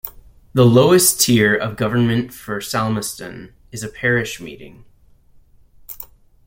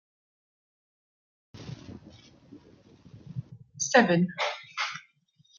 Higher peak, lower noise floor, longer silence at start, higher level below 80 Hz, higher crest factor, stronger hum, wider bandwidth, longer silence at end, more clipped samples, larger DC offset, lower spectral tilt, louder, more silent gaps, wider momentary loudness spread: first, 0 dBFS vs -8 dBFS; second, -49 dBFS vs -65 dBFS; second, 0.05 s vs 1.55 s; first, -48 dBFS vs -68 dBFS; second, 18 dB vs 26 dB; neither; first, 16.5 kHz vs 7.4 kHz; second, 0.4 s vs 0.6 s; neither; neither; about the same, -4.5 dB/octave vs -4 dB/octave; first, -16 LUFS vs -26 LUFS; neither; second, 22 LU vs 25 LU